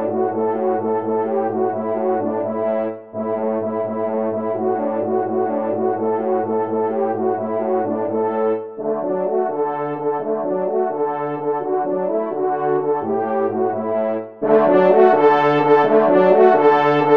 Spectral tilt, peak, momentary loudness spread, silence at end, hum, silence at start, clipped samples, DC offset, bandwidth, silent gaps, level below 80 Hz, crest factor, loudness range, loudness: -8.5 dB/octave; -2 dBFS; 9 LU; 0 s; none; 0 s; under 0.1%; 0.2%; 5.6 kHz; none; -68 dBFS; 16 dB; 7 LU; -19 LUFS